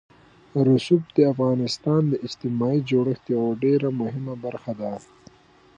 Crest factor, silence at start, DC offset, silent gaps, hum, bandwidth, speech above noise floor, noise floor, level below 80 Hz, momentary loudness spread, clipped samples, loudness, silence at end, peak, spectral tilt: 18 dB; 0.55 s; under 0.1%; none; none; 9.8 kHz; 30 dB; -52 dBFS; -64 dBFS; 12 LU; under 0.1%; -23 LUFS; 0.8 s; -6 dBFS; -7.5 dB/octave